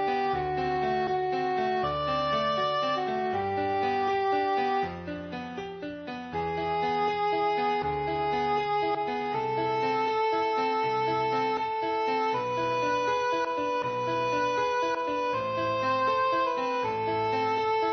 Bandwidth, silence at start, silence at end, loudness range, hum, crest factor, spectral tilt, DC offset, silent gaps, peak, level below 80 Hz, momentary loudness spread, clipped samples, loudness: 6.4 kHz; 0 s; 0 s; 2 LU; none; 12 dB; -3 dB/octave; under 0.1%; none; -16 dBFS; -58 dBFS; 3 LU; under 0.1%; -28 LUFS